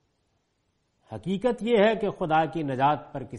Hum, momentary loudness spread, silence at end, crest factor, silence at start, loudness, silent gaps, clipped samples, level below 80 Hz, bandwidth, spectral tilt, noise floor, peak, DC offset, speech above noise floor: none; 10 LU; 0 s; 16 dB; 1.1 s; -25 LUFS; none; under 0.1%; -56 dBFS; 11 kHz; -7 dB/octave; -73 dBFS; -10 dBFS; under 0.1%; 48 dB